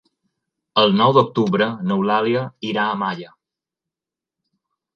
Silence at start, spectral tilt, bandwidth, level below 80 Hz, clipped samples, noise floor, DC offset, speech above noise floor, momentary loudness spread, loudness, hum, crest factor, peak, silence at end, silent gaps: 0.75 s; -7 dB/octave; 6.8 kHz; -66 dBFS; under 0.1%; -88 dBFS; under 0.1%; 70 dB; 10 LU; -18 LUFS; none; 20 dB; 0 dBFS; 1.7 s; none